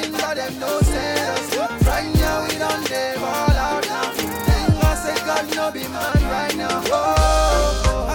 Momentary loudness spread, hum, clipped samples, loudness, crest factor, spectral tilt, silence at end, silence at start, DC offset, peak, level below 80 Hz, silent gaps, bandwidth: 6 LU; none; under 0.1%; -20 LUFS; 16 dB; -4.5 dB/octave; 0 s; 0 s; under 0.1%; -4 dBFS; -24 dBFS; none; 19 kHz